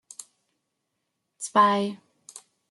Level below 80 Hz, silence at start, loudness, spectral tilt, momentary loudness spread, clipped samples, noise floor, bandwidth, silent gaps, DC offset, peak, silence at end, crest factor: -78 dBFS; 1.4 s; -23 LUFS; -4 dB/octave; 26 LU; under 0.1%; -80 dBFS; 12 kHz; none; under 0.1%; -8 dBFS; 0.3 s; 22 dB